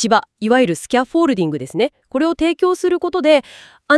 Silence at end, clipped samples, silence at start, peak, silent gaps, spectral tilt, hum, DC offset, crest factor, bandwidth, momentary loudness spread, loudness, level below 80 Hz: 0 s; under 0.1%; 0 s; 0 dBFS; none; -4.5 dB/octave; none; under 0.1%; 16 dB; 12 kHz; 5 LU; -17 LUFS; -52 dBFS